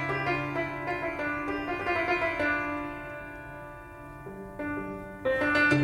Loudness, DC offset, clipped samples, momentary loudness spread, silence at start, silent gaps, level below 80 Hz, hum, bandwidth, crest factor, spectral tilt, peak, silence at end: -30 LUFS; under 0.1%; under 0.1%; 16 LU; 0 s; none; -52 dBFS; none; 16 kHz; 18 dB; -6.5 dB/octave; -12 dBFS; 0 s